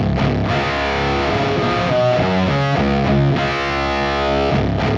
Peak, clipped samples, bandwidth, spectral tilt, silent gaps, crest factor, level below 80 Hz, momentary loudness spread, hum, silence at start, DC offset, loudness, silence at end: -4 dBFS; under 0.1%; 7.6 kHz; -6.5 dB/octave; none; 12 dB; -30 dBFS; 3 LU; none; 0 s; under 0.1%; -17 LUFS; 0 s